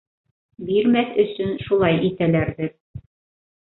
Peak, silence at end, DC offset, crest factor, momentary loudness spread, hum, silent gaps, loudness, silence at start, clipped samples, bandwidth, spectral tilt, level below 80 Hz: -4 dBFS; 0.6 s; under 0.1%; 18 dB; 11 LU; none; 2.80-2.94 s; -21 LUFS; 0.6 s; under 0.1%; 4.1 kHz; -11.5 dB/octave; -50 dBFS